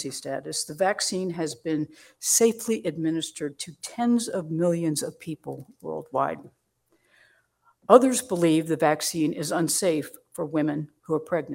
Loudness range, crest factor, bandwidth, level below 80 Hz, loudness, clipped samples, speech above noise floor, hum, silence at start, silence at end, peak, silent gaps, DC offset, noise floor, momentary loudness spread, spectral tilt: 6 LU; 26 dB; 16.5 kHz; -70 dBFS; -25 LUFS; under 0.1%; 44 dB; none; 0 s; 0 s; 0 dBFS; none; under 0.1%; -69 dBFS; 16 LU; -4 dB/octave